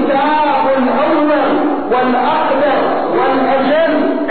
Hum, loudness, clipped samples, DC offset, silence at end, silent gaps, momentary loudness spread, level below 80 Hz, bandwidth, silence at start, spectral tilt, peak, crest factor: none; -13 LUFS; under 0.1%; 3%; 0 s; none; 2 LU; -52 dBFS; 4.6 kHz; 0 s; -2.5 dB/octave; -2 dBFS; 10 dB